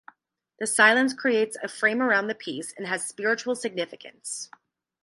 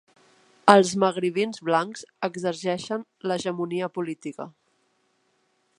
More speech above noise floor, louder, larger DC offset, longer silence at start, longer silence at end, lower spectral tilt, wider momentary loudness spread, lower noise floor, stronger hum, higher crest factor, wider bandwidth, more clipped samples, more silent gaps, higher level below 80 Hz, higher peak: about the same, 43 dB vs 45 dB; about the same, -24 LUFS vs -24 LUFS; neither; about the same, 0.6 s vs 0.65 s; second, 0.6 s vs 1.3 s; second, -2 dB/octave vs -5 dB/octave; about the same, 16 LU vs 17 LU; about the same, -68 dBFS vs -69 dBFS; neither; about the same, 22 dB vs 26 dB; about the same, 11.5 kHz vs 11.5 kHz; neither; neither; second, -80 dBFS vs -72 dBFS; second, -4 dBFS vs 0 dBFS